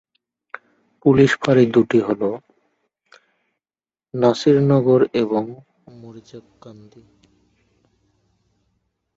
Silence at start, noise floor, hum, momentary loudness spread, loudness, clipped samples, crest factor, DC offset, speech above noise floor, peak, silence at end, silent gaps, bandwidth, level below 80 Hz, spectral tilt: 1.05 s; under -90 dBFS; none; 24 LU; -17 LUFS; under 0.1%; 20 dB; under 0.1%; over 73 dB; -2 dBFS; 2.45 s; none; 8 kHz; -58 dBFS; -7.5 dB/octave